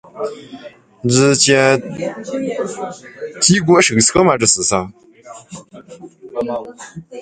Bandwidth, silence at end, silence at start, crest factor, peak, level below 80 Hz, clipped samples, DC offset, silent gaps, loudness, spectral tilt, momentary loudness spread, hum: 9.6 kHz; 0 s; 0.15 s; 18 dB; 0 dBFS; -50 dBFS; under 0.1%; under 0.1%; none; -14 LUFS; -3.5 dB/octave; 23 LU; none